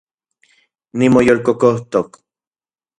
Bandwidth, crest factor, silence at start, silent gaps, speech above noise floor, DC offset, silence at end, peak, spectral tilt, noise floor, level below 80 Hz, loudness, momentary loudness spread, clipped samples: 11 kHz; 16 dB; 0.95 s; none; over 76 dB; under 0.1%; 0.9 s; 0 dBFS; -7 dB/octave; under -90 dBFS; -50 dBFS; -14 LUFS; 14 LU; under 0.1%